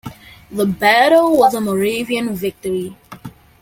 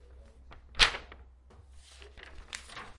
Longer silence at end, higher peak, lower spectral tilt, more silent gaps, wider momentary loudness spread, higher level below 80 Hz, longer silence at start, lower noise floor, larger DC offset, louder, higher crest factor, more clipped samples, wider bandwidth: first, 0.3 s vs 0.05 s; first, -2 dBFS vs -6 dBFS; first, -4.5 dB/octave vs -0.5 dB/octave; neither; second, 24 LU vs 27 LU; about the same, -50 dBFS vs -46 dBFS; about the same, 0.05 s vs 0.1 s; second, -36 dBFS vs -56 dBFS; neither; first, -15 LUFS vs -28 LUFS; second, 16 dB vs 30 dB; neither; first, 17 kHz vs 11.5 kHz